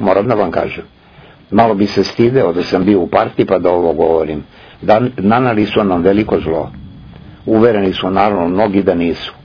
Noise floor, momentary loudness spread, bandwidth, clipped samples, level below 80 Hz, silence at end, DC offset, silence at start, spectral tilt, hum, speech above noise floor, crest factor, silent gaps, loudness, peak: -41 dBFS; 7 LU; 5.4 kHz; under 0.1%; -40 dBFS; 0.1 s; under 0.1%; 0 s; -7.5 dB/octave; none; 29 dB; 14 dB; none; -13 LUFS; 0 dBFS